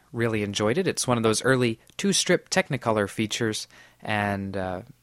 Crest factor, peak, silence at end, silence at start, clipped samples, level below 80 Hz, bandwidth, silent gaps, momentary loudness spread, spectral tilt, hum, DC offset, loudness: 20 dB; -6 dBFS; 0.15 s; 0.15 s; under 0.1%; -58 dBFS; 16 kHz; none; 9 LU; -4 dB/octave; none; under 0.1%; -25 LUFS